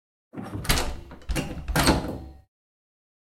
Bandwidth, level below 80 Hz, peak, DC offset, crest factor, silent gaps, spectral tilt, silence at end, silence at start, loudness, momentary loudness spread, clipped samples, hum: 16.5 kHz; -34 dBFS; -4 dBFS; under 0.1%; 24 dB; none; -4 dB/octave; 1 s; 0.35 s; -27 LUFS; 19 LU; under 0.1%; none